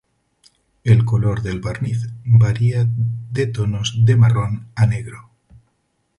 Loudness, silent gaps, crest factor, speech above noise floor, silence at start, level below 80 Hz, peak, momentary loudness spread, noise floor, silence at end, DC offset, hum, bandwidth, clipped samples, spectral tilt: -18 LUFS; none; 16 dB; 51 dB; 0.85 s; -42 dBFS; -2 dBFS; 11 LU; -68 dBFS; 1 s; under 0.1%; none; 10.5 kHz; under 0.1%; -7 dB/octave